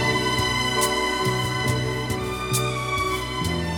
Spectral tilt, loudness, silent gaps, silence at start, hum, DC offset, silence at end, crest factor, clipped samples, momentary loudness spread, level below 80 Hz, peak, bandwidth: -4 dB/octave; -23 LUFS; none; 0 s; none; 0.2%; 0 s; 16 dB; under 0.1%; 5 LU; -40 dBFS; -8 dBFS; 19.5 kHz